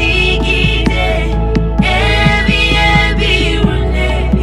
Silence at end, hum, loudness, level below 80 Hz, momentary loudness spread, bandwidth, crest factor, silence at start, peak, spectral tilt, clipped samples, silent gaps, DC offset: 0 s; none; -12 LUFS; -16 dBFS; 5 LU; 11 kHz; 12 dB; 0 s; 0 dBFS; -5.5 dB/octave; under 0.1%; none; under 0.1%